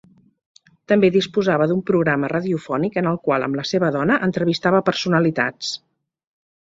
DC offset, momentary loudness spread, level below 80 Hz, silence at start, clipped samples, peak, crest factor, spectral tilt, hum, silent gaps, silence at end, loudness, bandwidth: under 0.1%; 5 LU; -60 dBFS; 0.9 s; under 0.1%; -2 dBFS; 18 dB; -6 dB/octave; none; none; 0.9 s; -19 LUFS; 7.8 kHz